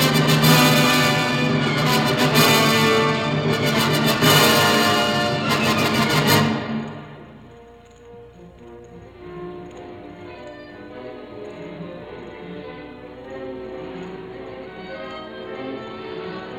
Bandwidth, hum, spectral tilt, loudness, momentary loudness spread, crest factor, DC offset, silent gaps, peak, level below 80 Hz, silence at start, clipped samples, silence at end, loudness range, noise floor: 18 kHz; none; -4 dB/octave; -17 LUFS; 23 LU; 20 dB; under 0.1%; none; -2 dBFS; -52 dBFS; 0 s; under 0.1%; 0 s; 22 LU; -45 dBFS